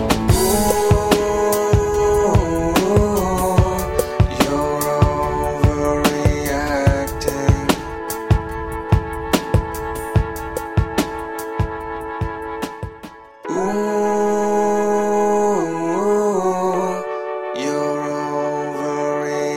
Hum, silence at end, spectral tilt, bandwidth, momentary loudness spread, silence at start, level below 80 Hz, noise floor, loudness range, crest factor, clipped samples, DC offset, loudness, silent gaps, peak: none; 0 s; -5.5 dB/octave; 16.5 kHz; 10 LU; 0 s; -28 dBFS; -39 dBFS; 7 LU; 18 dB; under 0.1%; under 0.1%; -19 LUFS; none; -2 dBFS